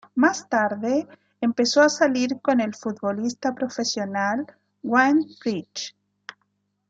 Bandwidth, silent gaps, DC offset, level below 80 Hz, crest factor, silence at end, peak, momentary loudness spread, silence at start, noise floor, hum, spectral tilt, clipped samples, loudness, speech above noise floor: 7.8 kHz; none; under 0.1%; -72 dBFS; 18 dB; 1 s; -4 dBFS; 18 LU; 0.15 s; -72 dBFS; 50 Hz at -45 dBFS; -3.5 dB/octave; under 0.1%; -23 LUFS; 50 dB